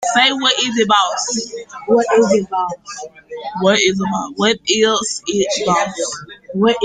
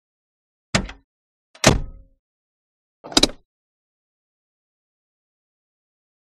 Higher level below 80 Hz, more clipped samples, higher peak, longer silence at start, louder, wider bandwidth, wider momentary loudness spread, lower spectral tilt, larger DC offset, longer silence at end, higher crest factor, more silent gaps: second, -56 dBFS vs -38 dBFS; neither; about the same, 0 dBFS vs 0 dBFS; second, 0 s vs 0.75 s; first, -16 LUFS vs -20 LUFS; second, 9.6 kHz vs 13 kHz; about the same, 15 LU vs 15 LU; about the same, -3 dB/octave vs -3 dB/octave; neither; second, 0 s vs 3 s; second, 16 dB vs 28 dB; second, none vs 1.04-1.54 s, 2.19-3.04 s